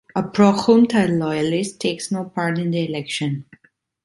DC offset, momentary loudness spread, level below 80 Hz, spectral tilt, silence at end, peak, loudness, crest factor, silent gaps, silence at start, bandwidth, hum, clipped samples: under 0.1%; 10 LU; -60 dBFS; -6 dB/octave; 0.65 s; -2 dBFS; -19 LUFS; 18 dB; none; 0.15 s; 11.5 kHz; none; under 0.1%